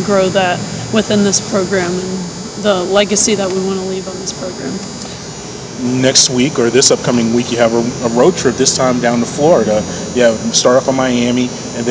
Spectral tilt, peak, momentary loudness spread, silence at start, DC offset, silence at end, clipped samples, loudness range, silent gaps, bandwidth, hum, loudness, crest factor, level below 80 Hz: -3.5 dB/octave; 0 dBFS; 12 LU; 0 s; under 0.1%; 0 s; 0.2%; 4 LU; none; 8 kHz; none; -13 LUFS; 14 dB; -42 dBFS